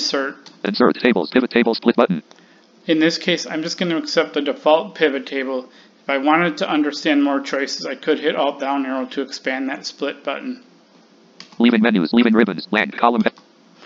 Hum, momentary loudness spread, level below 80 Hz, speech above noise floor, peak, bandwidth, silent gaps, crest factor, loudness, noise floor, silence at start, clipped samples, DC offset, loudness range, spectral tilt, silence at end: none; 10 LU; -66 dBFS; 32 dB; 0 dBFS; 7.8 kHz; none; 18 dB; -19 LUFS; -51 dBFS; 0 s; under 0.1%; under 0.1%; 5 LU; -5 dB/octave; 0 s